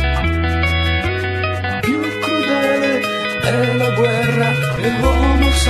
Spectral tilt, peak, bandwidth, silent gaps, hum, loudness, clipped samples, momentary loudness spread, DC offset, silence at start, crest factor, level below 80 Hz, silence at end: -5.5 dB/octave; -2 dBFS; 14 kHz; none; none; -16 LUFS; under 0.1%; 4 LU; under 0.1%; 0 s; 14 dB; -24 dBFS; 0 s